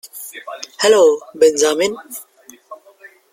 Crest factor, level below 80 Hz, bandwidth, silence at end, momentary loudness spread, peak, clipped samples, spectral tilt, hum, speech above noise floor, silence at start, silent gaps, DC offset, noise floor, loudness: 16 dB; -62 dBFS; 16.5 kHz; 0.6 s; 20 LU; 0 dBFS; under 0.1%; -1.5 dB/octave; none; 30 dB; 0.05 s; none; under 0.1%; -45 dBFS; -14 LUFS